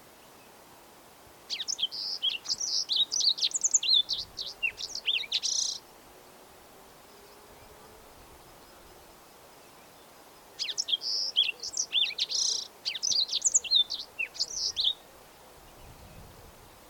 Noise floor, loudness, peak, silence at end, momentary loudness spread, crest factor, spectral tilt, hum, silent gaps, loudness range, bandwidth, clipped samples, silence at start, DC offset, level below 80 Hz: -54 dBFS; -27 LUFS; -12 dBFS; 0 s; 10 LU; 20 dB; 2.5 dB/octave; none; none; 9 LU; 19 kHz; under 0.1%; 0 s; under 0.1%; -64 dBFS